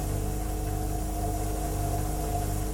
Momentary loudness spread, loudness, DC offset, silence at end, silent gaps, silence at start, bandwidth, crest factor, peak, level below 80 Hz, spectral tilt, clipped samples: 2 LU; -31 LUFS; under 0.1%; 0 s; none; 0 s; 17.5 kHz; 12 dB; -18 dBFS; -32 dBFS; -5.5 dB/octave; under 0.1%